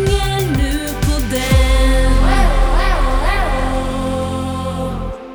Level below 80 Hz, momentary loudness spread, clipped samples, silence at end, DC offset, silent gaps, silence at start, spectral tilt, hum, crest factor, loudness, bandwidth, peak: -16 dBFS; 7 LU; under 0.1%; 0 s; under 0.1%; none; 0 s; -5.5 dB/octave; none; 12 dB; -17 LUFS; over 20 kHz; -2 dBFS